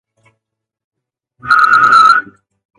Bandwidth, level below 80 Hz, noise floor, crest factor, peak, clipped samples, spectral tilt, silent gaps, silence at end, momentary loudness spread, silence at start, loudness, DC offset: 11 kHz; -58 dBFS; -76 dBFS; 14 dB; 0 dBFS; under 0.1%; -1.5 dB/octave; none; 0.6 s; 8 LU; 1.45 s; -8 LUFS; under 0.1%